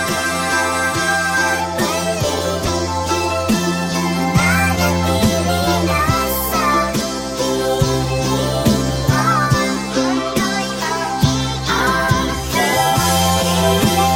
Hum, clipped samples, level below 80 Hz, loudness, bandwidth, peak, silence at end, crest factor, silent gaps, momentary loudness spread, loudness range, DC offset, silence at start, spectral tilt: none; under 0.1%; -32 dBFS; -16 LUFS; 17 kHz; -2 dBFS; 0 s; 16 dB; none; 5 LU; 2 LU; under 0.1%; 0 s; -4 dB/octave